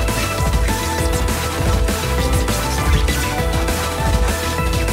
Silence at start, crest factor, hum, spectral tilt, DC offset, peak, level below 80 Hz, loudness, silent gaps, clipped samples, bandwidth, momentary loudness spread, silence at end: 0 s; 14 dB; none; -4.5 dB/octave; under 0.1%; -4 dBFS; -20 dBFS; -19 LUFS; none; under 0.1%; 16.5 kHz; 2 LU; 0 s